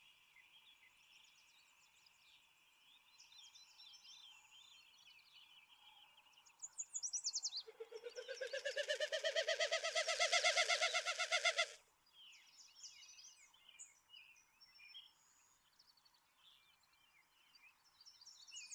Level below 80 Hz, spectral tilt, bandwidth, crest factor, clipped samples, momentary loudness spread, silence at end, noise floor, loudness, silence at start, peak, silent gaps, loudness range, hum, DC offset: under -90 dBFS; 4 dB/octave; over 20 kHz; 28 dB; under 0.1%; 27 LU; 0 s; -74 dBFS; -39 LUFS; 0.4 s; -20 dBFS; none; 25 LU; none; under 0.1%